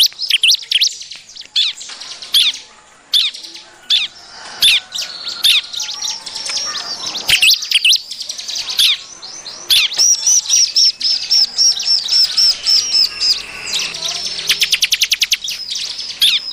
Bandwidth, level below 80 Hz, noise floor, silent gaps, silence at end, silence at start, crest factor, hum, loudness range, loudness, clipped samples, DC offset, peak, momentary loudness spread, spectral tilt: 16 kHz; -54 dBFS; -43 dBFS; none; 0 s; 0 s; 14 dB; none; 5 LU; -12 LUFS; under 0.1%; under 0.1%; -2 dBFS; 14 LU; 3.5 dB/octave